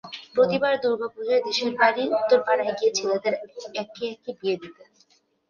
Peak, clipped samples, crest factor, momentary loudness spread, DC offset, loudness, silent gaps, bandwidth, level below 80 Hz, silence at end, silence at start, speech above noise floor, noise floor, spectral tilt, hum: -4 dBFS; under 0.1%; 20 dB; 12 LU; under 0.1%; -24 LUFS; none; 7.2 kHz; -70 dBFS; 0.75 s; 0.05 s; 39 dB; -63 dBFS; -3.5 dB/octave; none